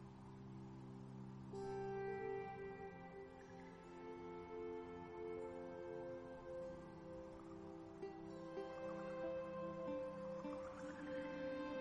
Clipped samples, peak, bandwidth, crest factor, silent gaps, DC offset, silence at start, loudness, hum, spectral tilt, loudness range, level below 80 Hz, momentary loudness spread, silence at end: under 0.1%; -36 dBFS; 10.5 kHz; 14 dB; none; under 0.1%; 0 s; -51 LUFS; none; -7 dB/octave; 4 LU; -72 dBFS; 9 LU; 0 s